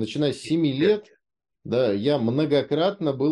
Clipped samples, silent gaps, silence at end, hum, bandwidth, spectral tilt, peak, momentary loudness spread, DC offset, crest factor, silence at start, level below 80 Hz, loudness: under 0.1%; none; 0 s; none; 11 kHz; -7 dB/octave; -10 dBFS; 4 LU; under 0.1%; 14 dB; 0 s; -64 dBFS; -23 LUFS